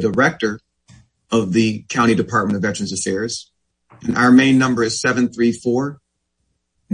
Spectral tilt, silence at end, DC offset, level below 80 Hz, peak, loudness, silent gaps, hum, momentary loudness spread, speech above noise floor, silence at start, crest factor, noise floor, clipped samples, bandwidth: -5 dB/octave; 0 s; under 0.1%; -56 dBFS; -2 dBFS; -17 LUFS; none; none; 12 LU; 54 dB; 0 s; 16 dB; -71 dBFS; under 0.1%; 10.5 kHz